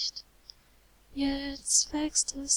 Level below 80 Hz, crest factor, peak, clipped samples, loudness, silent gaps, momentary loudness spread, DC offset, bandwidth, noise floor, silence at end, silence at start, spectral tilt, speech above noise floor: -52 dBFS; 22 dB; -10 dBFS; under 0.1%; -28 LUFS; none; 14 LU; under 0.1%; 19.5 kHz; -61 dBFS; 0 s; 0 s; -0.5 dB/octave; 32 dB